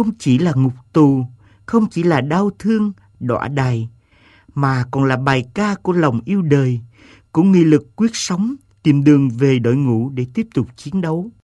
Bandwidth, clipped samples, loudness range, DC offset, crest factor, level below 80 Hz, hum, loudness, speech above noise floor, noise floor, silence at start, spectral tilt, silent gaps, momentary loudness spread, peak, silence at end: 11.5 kHz; under 0.1%; 4 LU; under 0.1%; 16 dB; -50 dBFS; none; -17 LUFS; 35 dB; -51 dBFS; 0 s; -7 dB/octave; none; 9 LU; 0 dBFS; 0.25 s